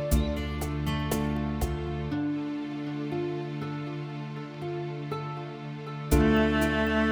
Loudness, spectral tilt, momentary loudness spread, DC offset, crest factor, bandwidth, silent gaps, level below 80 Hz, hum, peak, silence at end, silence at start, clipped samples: -30 LUFS; -6 dB/octave; 13 LU; under 0.1%; 20 dB; over 20 kHz; none; -36 dBFS; none; -10 dBFS; 0 s; 0 s; under 0.1%